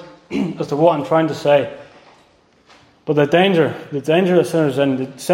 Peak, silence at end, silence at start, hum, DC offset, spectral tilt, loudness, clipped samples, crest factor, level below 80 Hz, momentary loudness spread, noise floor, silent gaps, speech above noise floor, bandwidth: 0 dBFS; 0 s; 0 s; none; under 0.1%; -6.5 dB/octave; -17 LUFS; under 0.1%; 16 dB; -60 dBFS; 10 LU; -54 dBFS; none; 38 dB; 16.5 kHz